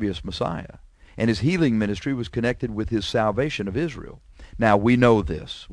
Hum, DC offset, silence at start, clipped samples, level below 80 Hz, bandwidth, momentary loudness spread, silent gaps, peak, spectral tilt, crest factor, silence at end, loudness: none; under 0.1%; 0 s; under 0.1%; -42 dBFS; 11 kHz; 12 LU; none; -4 dBFS; -6.5 dB/octave; 20 dB; 0 s; -23 LUFS